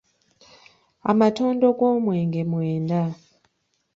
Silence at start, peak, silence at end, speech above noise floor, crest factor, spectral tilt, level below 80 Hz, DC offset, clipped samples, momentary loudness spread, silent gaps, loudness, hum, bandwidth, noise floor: 1.05 s; -6 dBFS; 0.8 s; 50 dB; 18 dB; -8.5 dB/octave; -64 dBFS; under 0.1%; under 0.1%; 9 LU; none; -22 LUFS; none; 7.8 kHz; -71 dBFS